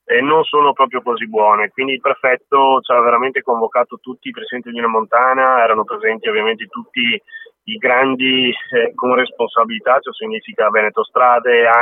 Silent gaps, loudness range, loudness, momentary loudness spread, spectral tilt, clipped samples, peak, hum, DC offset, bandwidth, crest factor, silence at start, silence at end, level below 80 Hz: none; 2 LU; -15 LUFS; 12 LU; -7 dB/octave; under 0.1%; 0 dBFS; none; under 0.1%; 3.9 kHz; 14 dB; 0.1 s; 0 s; -74 dBFS